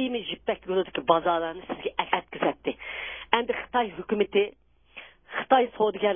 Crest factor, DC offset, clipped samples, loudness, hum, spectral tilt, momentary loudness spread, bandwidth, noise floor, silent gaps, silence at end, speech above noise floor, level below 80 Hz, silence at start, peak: 24 dB; under 0.1%; under 0.1%; -27 LUFS; none; -8.5 dB/octave; 11 LU; 3.7 kHz; -49 dBFS; none; 0 s; 23 dB; -60 dBFS; 0 s; -4 dBFS